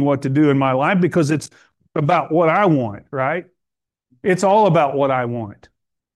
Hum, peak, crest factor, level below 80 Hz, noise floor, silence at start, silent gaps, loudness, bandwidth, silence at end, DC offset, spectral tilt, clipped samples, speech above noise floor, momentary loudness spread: none; -4 dBFS; 14 dB; -62 dBFS; -83 dBFS; 0 s; none; -17 LUFS; 12.5 kHz; 0.6 s; under 0.1%; -7 dB/octave; under 0.1%; 66 dB; 12 LU